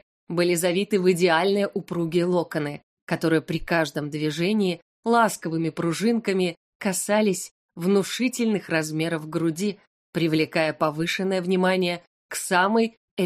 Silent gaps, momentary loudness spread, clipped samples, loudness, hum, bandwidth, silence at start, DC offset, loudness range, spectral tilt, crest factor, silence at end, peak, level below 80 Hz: 2.83-3.07 s, 4.82-5.03 s, 6.57-6.80 s, 7.51-7.69 s, 9.87-10.13 s, 12.07-12.29 s, 12.97-13.17 s; 9 LU; under 0.1%; -24 LUFS; none; 15.5 kHz; 0.3 s; under 0.1%; 2 LU; -5 dB/octave; 18 dB; 0 s; -6 dBFS; -56 dBFS